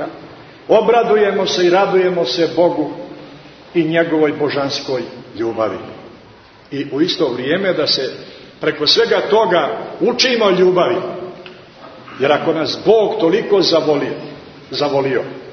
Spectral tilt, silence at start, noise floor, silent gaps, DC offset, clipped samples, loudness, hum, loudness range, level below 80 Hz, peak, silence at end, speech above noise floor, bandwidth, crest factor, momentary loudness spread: -4.5 dB/octave; 0 s; -43 dBFS; none; under 0.1%; under 0.1%; -15 LUFS; none; 5 LU; -58 dBFS; 0 dBFS; 0 s; 28 dB; 6.6 kHz; 16 dB; 17 LU